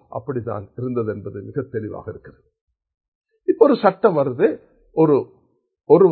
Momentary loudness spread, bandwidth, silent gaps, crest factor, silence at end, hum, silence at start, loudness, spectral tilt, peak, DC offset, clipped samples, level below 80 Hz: 18 LU; 4.5 kHz; 2.61-2.67 s, 3.08-3.21 s; 20 dB; 0 s; none; 0.1 s; -20 LUFS; -11.5 dB/octave; 0 dBFS; under 0.1%; under 0.1%; -56 dBFS